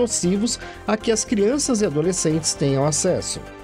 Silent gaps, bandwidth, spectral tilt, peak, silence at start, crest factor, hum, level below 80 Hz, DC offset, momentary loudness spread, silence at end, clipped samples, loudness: none; 15 kHz; -4 dB/octave; -8 dBFS; 0 s; 14 dB; none; -46 dBFS; under 0.1%; 5 LU; 0 s; under 0.1%; -21 LUFS